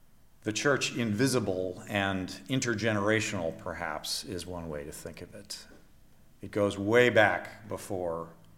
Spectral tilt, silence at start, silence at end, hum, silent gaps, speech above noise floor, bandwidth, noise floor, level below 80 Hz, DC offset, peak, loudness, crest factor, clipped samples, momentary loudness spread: -4.5 dB/octave; 0.45 s; 0 s; none; none; 26 dB; 16.5 kHz; -56 dBFS; -60 dBFS; under 0.1%; -8 dBFS; -30 LUFS; 24 dB; under 0.1%; 17 LU